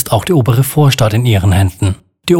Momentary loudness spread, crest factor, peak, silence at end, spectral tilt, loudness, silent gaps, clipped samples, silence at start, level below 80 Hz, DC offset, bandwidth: 8 LU; 10 dB; 0 dBFS; 0 s; -6 dB/octave; -12 LUFS; none; under 0.1%; 0 s; -38 dBFS; under 0.1%; 17.5 kHz